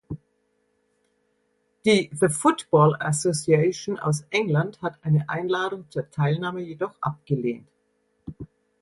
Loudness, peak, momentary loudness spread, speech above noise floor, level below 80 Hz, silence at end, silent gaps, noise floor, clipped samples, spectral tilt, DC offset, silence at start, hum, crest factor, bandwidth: -24 LUFS; -6 dBFS; 19 LU; 47 dB; -60 dBFS; 0.35 s; none; -70 dBFS; under 0.1%; -5.5 dB/octave; under 0.1%; 0.1 s; none; 20 dB; 11.5 kHz